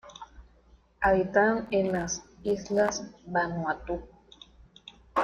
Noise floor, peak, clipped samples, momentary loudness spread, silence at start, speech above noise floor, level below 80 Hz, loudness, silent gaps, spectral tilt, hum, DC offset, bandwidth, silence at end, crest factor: -60 dBFS; -10 dBFS; under 0.1%; 16 LU; 0.05 s; 32 dB; -52 dBFS; -28 LUFS; none; -4.5 dB/octave; none; under 0.1%; 11 kHz; 0 s; 20 dB